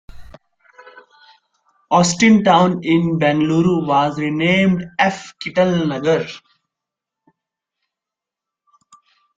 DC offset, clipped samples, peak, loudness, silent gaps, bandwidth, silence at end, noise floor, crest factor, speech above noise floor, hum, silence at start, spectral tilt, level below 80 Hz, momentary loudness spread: under 0.1%; under 0.1%; -2 dBFS; -16 LUFS; none; 9.4 kHz; 3 s; -86 dBFS; 18 dB; 70 dB; none; 0.1 s; -5.5 dB/octave; -52 dBFS; 8 LU